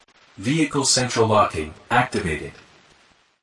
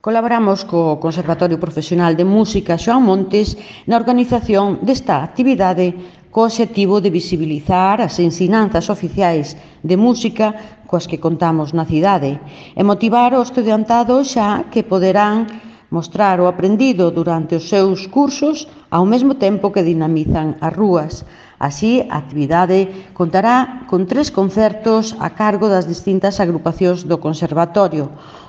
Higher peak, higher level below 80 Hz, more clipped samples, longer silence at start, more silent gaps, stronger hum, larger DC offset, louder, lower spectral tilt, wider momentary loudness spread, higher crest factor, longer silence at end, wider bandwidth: second, -6 dBFS vs 0 dBFS; second, -50 dBFS vs -42 dBFS; neither; first, 0.4 s vs 0.05 s; neither; neither; neither; second, -21 LUFS vs -15 LUFS; second, -3.5 dB/octave vs -6.5 dB/octave; first, 12 LU vs 8 LU; about the same, 18 dB vs 14 dB; first, 0.9 s vs 0.05 s; first, 11.5 kHz vs 8 kHz